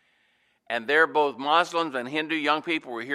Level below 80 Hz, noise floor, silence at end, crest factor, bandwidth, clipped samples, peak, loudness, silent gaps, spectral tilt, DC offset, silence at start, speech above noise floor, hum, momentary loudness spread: -82 dBFS; -68 dBFS; 0 s; 20 dB; 13.5 kHz; under 0.1%; -6 dBFS; -24 LUFS; none; -3.5 dB/octave; under 0.1%; 0.7 s; 43 dB; none; 8 LU